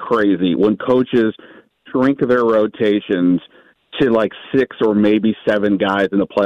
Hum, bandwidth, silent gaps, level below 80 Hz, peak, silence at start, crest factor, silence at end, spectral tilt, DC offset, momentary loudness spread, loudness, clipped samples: none; 7.2 kHz; none; -54 dBFS; -4 dBFS; 0 s; 12 dB; 0 s; -8 dB/octave; under 0.1%; 5 LU; -16 LUFS; under 0.1%